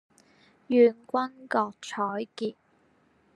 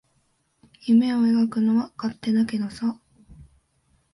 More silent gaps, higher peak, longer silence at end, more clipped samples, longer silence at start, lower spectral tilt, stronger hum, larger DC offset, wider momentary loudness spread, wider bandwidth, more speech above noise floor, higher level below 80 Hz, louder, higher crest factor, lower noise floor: neither; about the same, -10 dBFS vs -10 dBFS; first, 0.85 s vs 0.7 s; neither; second, 0.7 s vs 0.85 s; second, -5.5 dB/octave vs -7 dB/octave; neither; neither; about the same, 13 LU vs 11 LU; second, 10 kHz vs 11.5 kHz; second, 39 dB vs 47 dB; second, -84 dBFS vs -60 dBFS; second, -27 LUFS vs -23 LUFS; first, 20 dB vs 14 dB; about the same, -65 dBFS vs -68 dBFS